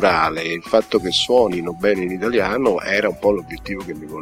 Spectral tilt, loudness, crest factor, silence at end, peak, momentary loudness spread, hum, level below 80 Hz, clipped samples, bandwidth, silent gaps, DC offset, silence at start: -4.5 dB/octave; -19 LUFS; 18 dB; 0 s; -2 dBFS; 12 LU; none; -46 dBFS; under 0.1%; 16 kHz; none; under 0.1%; 0 s